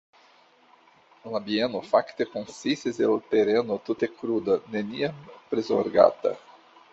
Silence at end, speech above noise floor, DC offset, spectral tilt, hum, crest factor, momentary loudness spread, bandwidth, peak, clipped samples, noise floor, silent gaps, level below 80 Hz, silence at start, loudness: 0.55 s; 33 dB; under 0.1%; -5.5 dB/octave; none; 22 dB; 11 LU; 8 kHz; -4 dBFS; under 0.1%; -58 dBFS; none; -68 dBFS; 1.25 s; -26 LUFS